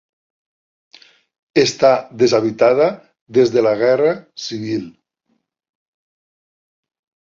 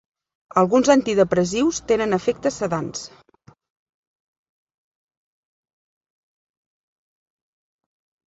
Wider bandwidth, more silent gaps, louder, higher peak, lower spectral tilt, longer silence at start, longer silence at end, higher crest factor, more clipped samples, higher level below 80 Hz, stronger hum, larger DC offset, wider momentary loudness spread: about the same, 7.8 kHz vs 8 kHz; first, 3.21-3.26 s vs none; first, -16 LUFS vs -20 LUFS; about the same, -2 dBFS vs -2 dBFS; about the same, -5 dB/octave vs -5 dB/octave; first, 1.55 s vs 0.55 s; second, 2.35 s vs 5.2 s; about the same, 18 dB vs 22 dB; neither; second, -62 dBFS vs -56 dBFS; neither; neither; about the same, 12 LU vs 11 LU